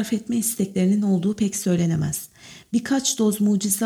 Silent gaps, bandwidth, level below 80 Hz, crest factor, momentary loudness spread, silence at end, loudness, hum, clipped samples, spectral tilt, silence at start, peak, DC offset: none; 17.5 kHz; -58 dBFS; 12 dB; 7 LU; 0 s; -22 LUFS; none; under 0.1%; -5 dB/octave; 0 s; -8 dBFS; under 0.1%